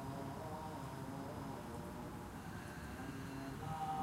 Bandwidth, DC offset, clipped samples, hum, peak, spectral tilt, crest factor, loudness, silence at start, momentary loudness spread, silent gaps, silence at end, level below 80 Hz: 16 kHz; under 0.1%; under 0.1%; none; -32 dBFS; -6 dB/octave; 14 dB; -47 LUFS; 0 s; 4 LU; none; 0 s; -60 dBFS